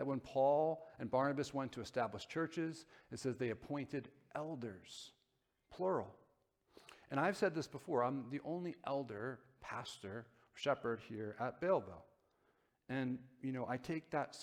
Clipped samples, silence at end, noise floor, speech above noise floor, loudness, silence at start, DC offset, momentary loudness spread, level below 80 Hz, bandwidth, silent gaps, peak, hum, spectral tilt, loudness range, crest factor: under 0.1%; 0 s; -83 dBFS; 42 dB; -41 LUFS; 0 s; under 0.1%; 16 LU; -76 dBFS; 14.5 kHz; none; -22 dBFS; none; -6 dB/octave; 5 LU; 20 dB